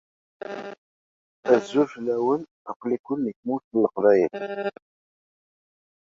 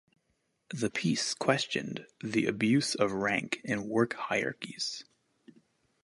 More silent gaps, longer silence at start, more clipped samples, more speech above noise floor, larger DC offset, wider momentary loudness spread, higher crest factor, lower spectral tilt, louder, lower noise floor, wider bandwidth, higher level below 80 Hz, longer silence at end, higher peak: first, 0.78-1.43 s, 2.51-2.65 s, 2.76-2.80 s, 2.99-3.04 s, 3.36-3.43 s, 3.64-3.71 s vs none; second, 0.45 s vs 0.7 s; neither; first, over 66 dB vs 46 dB; neither; first, 17 LU vs 9 LU; about the same, 22 dB vs 24 dB; first, -6.5 dB/octave vs -4 dB/octave; first, -24 LUFS vs -31 LUFS; first, under -90 dBFS vs -77 dBFS; second, 7.6 kHz vs 11.5 kHz; about the same, -70 dBFS vs -70 dBFS; first, 1.35 s vs 1 s; first, -4 dBFS vs -8 dBFS